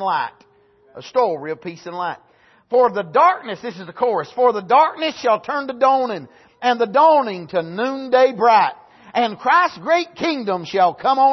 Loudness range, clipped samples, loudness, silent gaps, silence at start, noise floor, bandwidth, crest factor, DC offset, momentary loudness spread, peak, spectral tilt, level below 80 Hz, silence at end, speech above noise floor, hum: 4 LU; under 0.1%; -18 LUFS; none; 0 s; -54 dBFS; 6.2 kHz; 16 dB; under 0.1%; 13 LU; -2 dBFS; -5 dB/octave; -68 dBFS; 0 s; 37 dB; none